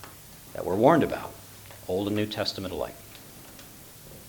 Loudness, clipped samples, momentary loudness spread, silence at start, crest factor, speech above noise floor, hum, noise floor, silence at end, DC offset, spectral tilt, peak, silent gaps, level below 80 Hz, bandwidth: -27 LUFS; under 0.1%; 24 LU; 0 s; 24 dB; 21 dB; none; -47 dBFS; 0 s; under 0.1%; -5.5 dB/octave; -6 dBFS; none; -56 dBFS; 19 kHz